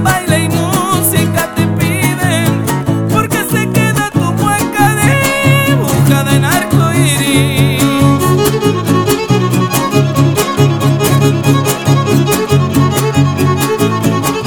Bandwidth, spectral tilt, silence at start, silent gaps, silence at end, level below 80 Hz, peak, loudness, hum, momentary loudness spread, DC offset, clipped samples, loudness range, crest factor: over 20 kHz; -5 dB/octave; 0 s; none; 0 s; -38 dBFS; 0 dBFS; -11 LUFS; none; 3 LU; 0.6%; under 0.1%; 2 LU; 10 dB